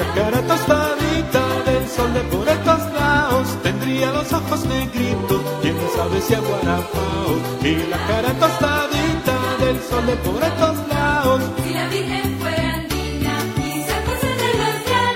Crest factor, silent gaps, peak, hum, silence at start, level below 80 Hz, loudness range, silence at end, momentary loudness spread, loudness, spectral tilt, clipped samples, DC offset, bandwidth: 16 dB; none; -2 dBFS; none; 0 s; -34 dBFS; 2 LU; 0 s; 5 LU; -19 LUFS; -5 dB/octave; under 0.1%; under 0.1%; 16.5 kHz